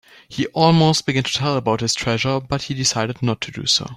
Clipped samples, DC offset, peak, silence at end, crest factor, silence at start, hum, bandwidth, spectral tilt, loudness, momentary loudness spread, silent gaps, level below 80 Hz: under 0.1%; under 0.1%; -2 dBFS; 0 s; 18 dB; 0.3 s; none; 13 kHz; -4 dB/octave; -19 LUFS; 9 LU; none; -50 dBFS